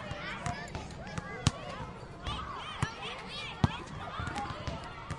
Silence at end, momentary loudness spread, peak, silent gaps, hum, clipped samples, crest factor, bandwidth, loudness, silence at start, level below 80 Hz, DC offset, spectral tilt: 0 s; 9 LU; -6 dBFS; none; none; under 0.1%; 32 dB; 11.5 kHz; -38 LUFS; 0 s; -50 dBFS; under 0.1%; -4.5 dB/octave